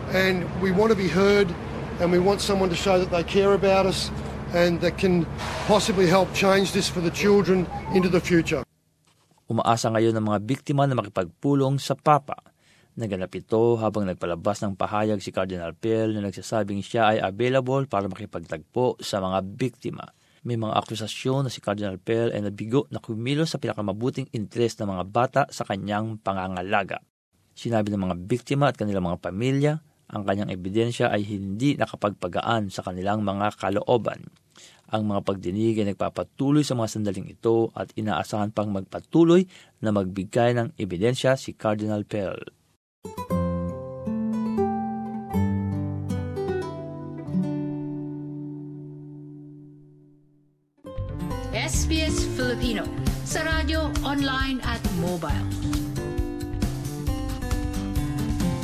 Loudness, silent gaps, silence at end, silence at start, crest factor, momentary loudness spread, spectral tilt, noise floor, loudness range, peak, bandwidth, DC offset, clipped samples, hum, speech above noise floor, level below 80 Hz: -25 LUFS; 27.10-27.32 s, 42.76-43.02 s; 0 s; 0 s; 22 dB; 12 LU; -6 dB/octave; -65 dBFS; 7 LU; -4 dBFS; 14.5 kHz; under 0.1%; under 0.1%; none; 41 dB; -40 dBFS